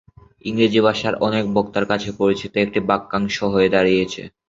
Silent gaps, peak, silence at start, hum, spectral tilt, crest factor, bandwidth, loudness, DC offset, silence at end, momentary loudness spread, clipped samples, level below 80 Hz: none; -2 dBFS; 0.45 s; none; -5.5 dB/octave; 18 dB; 7.8 kHz; -19 LUFS; under 0.1%; 0.2 s; 7 LU; under 0.1%; -50 dBFS